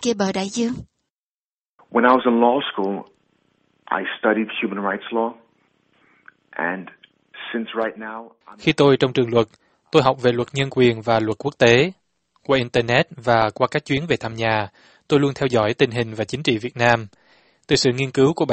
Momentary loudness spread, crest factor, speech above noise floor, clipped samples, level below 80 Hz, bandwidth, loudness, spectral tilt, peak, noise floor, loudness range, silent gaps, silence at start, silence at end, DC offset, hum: 11 LU; 20 dB; over 70 dB; under 0.1%; -54 dBFS; 8.8 kHz; -20 LUFS; -5.5 dB/octave; 0 dBFS; under -90 dBFS; 7 LU; 1.10-1.78 s; 0 s; 0 s; under 0.1%; none